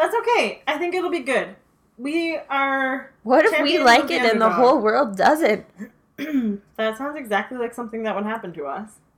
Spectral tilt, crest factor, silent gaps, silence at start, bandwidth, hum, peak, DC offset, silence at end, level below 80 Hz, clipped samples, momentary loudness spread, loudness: -4 dB/octave; 18 dB; none; 0 s; 18 kHz; none; -4 dBFS; under 0.1%; 0.3 s; -62 dBFS; under 0.1%; 15 LU; -20 LUFS